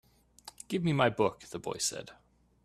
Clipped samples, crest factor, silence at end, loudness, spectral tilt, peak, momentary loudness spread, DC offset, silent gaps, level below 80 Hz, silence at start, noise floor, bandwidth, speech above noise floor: under 0.1%; 22 dB; 0.5 s; -31 LUFS; -4.5 dB/octave; -12 dBFS; 24 LU; under 0.1%; none; -64 dBFS; 0.45 s; -55 dBFS; 14 kHz; 24 dB